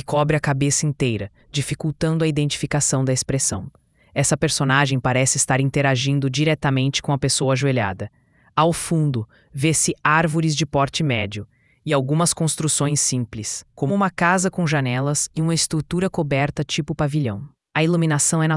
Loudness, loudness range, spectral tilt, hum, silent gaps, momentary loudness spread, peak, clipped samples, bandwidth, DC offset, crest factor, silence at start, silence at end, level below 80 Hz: -20 LUFS; 2 LU; -4.5 dB/octave; none; none; 9 LU; -2 dBFS; under 0.1%; 12 kHz; under 0.1%; 18 dB; 0.1 s; 0 s; -48 dBFS